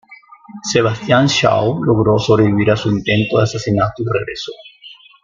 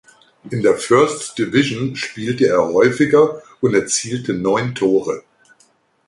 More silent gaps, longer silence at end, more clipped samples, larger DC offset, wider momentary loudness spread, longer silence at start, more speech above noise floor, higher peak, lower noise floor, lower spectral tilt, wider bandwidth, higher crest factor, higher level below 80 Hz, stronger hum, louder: neither; second, 0.3 s vs 0.9 s; neither; neither; first, 12 LU vs 9 LU; second, 0.1 s vs 0.45 s; second, 27 dB vs 41 dB; about the same, 0 dBFS vs -2 dBFS; second, -42 dBFS vs -57 dBFS; about the same, -5.5 dB/octave vs -4.5 dB/octave; second, 7.6 kHz vs 11.5 kHz; about the same, 16 dB vs 16 dB; first, -46 dBFS vs -54 dBFS; neither; about the same, -15 LUFS vs -17 LUFS